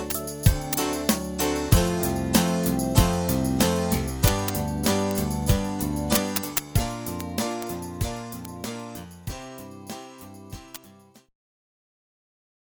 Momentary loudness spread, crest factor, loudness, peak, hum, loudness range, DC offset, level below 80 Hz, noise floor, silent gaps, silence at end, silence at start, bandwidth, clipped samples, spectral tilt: 17 LU; 22 dB; -25 LUFS; -4 dBFS; none; 16 LU; under 0.1%; -36 dBFS; -52 dBFS; none; 1.75 s; 0 s; over 20 kHz; under 0.1%; -5 dB/octave